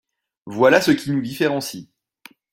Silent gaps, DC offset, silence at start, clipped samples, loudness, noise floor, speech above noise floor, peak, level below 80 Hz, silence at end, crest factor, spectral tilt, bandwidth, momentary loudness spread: none; under 0.1%; 0.45 s; under 0.1%; -18 LUFS; -50 dBFS; 31 dB; -2 dBFS; -60 dBFS; 0.7 s; 20 dB; -5 dB/octave; 16.5 kHz; 18 LU